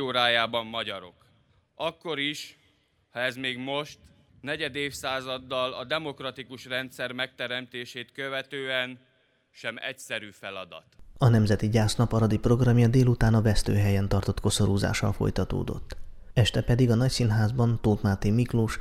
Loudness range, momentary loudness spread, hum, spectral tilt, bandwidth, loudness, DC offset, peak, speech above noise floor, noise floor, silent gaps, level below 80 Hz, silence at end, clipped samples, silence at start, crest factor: 9 LU; 15 LU; none; -5.5 dB/octave; 14 kHz; -27 LUFS; under 0.1%; -8 dBFS; 41 dB; -67 dBFS; none; -42 dBFS; 0 s; under 0.1%; 0 s; 20 dB